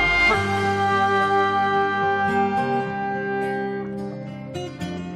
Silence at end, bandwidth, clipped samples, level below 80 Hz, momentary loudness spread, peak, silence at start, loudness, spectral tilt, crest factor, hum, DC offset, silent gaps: 0 s; 12.5 kHz; under 0.1%; -46 dBFS; 13 LU; -8 dBFS; 0 s; -22 LUFS; -5.5 dB/octave; 14 dB; none; under 0.1%; none